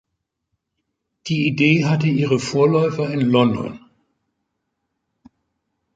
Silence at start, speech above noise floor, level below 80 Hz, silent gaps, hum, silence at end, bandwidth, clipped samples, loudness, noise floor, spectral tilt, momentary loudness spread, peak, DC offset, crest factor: 1.25 s; 59 dB; -58 dBFS; none; none; 2.2 s; 9.2 kHz; under 0.1%; -18 LUFS; -77 dBFS; -6.5 dB/octave; 10 LU; -2 dBFS; under 0.1%; 20 dB